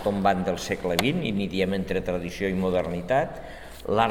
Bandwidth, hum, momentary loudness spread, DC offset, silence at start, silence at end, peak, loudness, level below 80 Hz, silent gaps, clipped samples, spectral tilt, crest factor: 17.5 kHz; none; 7 LU; 0.4%; 0 s; 0 s; -4 dBFS; -26 LUFS; -46 dBFS; none; under 0.1%; -5.5 dB/octave; 22 dB